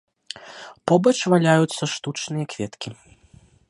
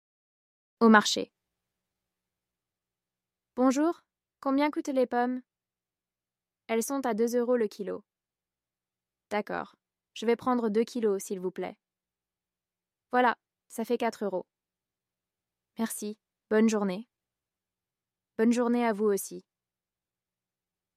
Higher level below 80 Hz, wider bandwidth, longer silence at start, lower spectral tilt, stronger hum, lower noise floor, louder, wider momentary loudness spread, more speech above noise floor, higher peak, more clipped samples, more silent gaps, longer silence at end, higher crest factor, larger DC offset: first, -62 dBFS vs -80 dBFS; second, 11.5 kHz vs 15.5 kHz; second, 0.35 s vs 0.8 s; about the same, -5.5 dB/octave vs -4.5 dB/octave; neither; second, -53 dBFS vs under -90 dBFS; first, -21 LUFS vs -28 LUFS; first, 20 LU vs 15 LU; second, 32 dB vs over 63 dB; first, -2 dBFS vs -6 dBFS; neither; neither; second, 0.75 s vs 1.55 s; about the same, 20 dB vs 24 dB; neither